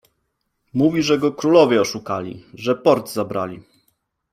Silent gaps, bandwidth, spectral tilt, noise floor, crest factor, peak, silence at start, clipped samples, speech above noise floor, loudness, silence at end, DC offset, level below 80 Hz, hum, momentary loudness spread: none; 16 kHz; -5.5 dB/octave; -72 dBFS; 18 dB; -2 dBFS; 0.75 s; under 0.1%; 54 dB; -19 LUFS; 0.75 s; under 0.1%; -60 dBFS; none; 13 LU